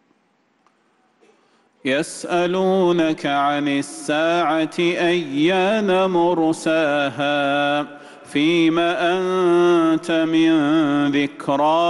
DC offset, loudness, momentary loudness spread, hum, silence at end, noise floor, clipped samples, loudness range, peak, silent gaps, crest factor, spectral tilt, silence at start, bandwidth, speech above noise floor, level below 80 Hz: under 0.1%; -19 LUFS; 6 LU; none; 0 s; -63 dBFS; under 0.1%; 4 LU; -8 dBFS; none; 10 dB; -5.5 dB/octave; 1.85 s; 12 kHz; 45 dB; -62 dBFS